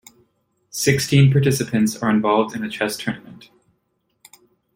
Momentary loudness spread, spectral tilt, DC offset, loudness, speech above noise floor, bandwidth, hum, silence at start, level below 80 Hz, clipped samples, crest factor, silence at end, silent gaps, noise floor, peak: 13 LU; -5.5 dB/octave; under 0.1%; -19 LUFS; 51 dB; 16.5 kHz; none; 0.75 s; -54 dBFS; under 0.1%; 18 dB; 1.4 s; none; -70 dBFS; -2 dBFS